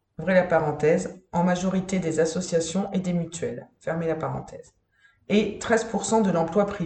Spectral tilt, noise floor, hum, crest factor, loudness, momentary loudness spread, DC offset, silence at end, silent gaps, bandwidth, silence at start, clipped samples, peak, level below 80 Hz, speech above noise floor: -5.5 dB/octave; -62 dBFS; none; 18 dB; -25 LUFS; 10 LU; under 0.1%; 0 s; none; 9 kHz; 0.2 s; under 0.1%; -8 dBFS; -56 dBFS; 38 dB